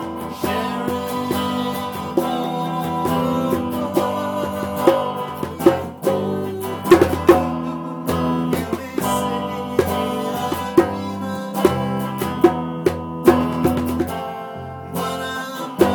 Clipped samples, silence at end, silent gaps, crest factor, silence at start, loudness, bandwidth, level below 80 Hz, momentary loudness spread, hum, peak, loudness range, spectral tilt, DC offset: under 0.1%; 0 s; none; 18 dB; 0 s; -21 LUFS; 19.5 kHz; -46 dBFS; 10 LU; none; -2 dBFS; 3 LU; -6 dB/octave; under 0.1%